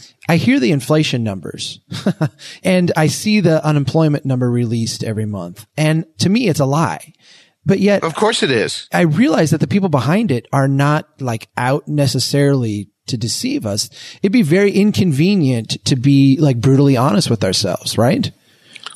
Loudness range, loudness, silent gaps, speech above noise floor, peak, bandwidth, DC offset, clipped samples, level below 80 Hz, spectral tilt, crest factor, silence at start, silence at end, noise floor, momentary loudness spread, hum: 4 LU; -16 LUFS; none; 24 dB; -2 dBFS; 13.5 kHz; under 0.1%; under 0.1%; -56 dBFS; -6 dB/octave; 14 dB; 0.3 s; 0 s; -39 dBFS; 10 LU; none